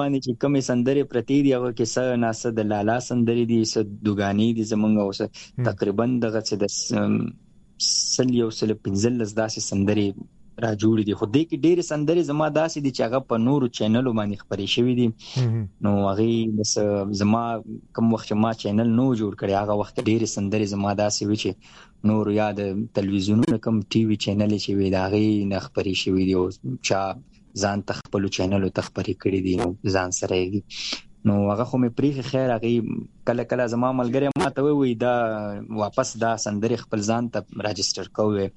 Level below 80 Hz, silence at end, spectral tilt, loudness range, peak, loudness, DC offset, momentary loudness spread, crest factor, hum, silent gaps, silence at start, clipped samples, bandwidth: -56 dBFS; 0.05 s; -5.5 dB/octave; 2 LU; -6 dBFS; -23 LUFS; under 0.1%; 6 LU; 18 dB; none; none; 0 s; under 0.1%; 10.5 kHz